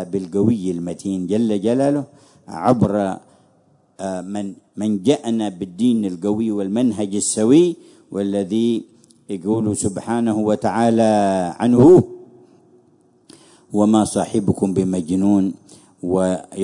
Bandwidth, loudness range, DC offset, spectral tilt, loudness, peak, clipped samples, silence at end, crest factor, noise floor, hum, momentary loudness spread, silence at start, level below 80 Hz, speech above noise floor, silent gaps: 11 kHz; 6 LU; under 0.1%; -6.5 dB/octave; -18 LUFS; -2 dBFS; under 0.1%; 0 s; 16 dB; -57 dBFS; none; 13 LU; 0 s; -58 dBFS; 39 dB; none